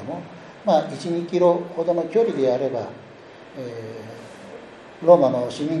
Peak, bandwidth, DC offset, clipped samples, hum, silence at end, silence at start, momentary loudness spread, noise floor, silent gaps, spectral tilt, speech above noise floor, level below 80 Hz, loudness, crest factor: -2 dBFS; 10.5 kHz; under 0.1%; under 0.1%; none; 0 s; 0 s; 24 LU; -43 dBFS; none; -7 dB/octave; 22 dB; -68 dBFS; -21 LUFS; 22 dB